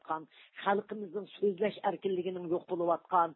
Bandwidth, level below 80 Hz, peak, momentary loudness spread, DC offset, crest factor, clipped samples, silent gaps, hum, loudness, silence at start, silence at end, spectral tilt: 4.2 kHz; -82 dBFS; -14 dBFS; 10 LU; under 0.1%; 18 dB; under 0.1%; none; none; -34 LUFS; 0.05 s; 0 s; -4.5 dB/octave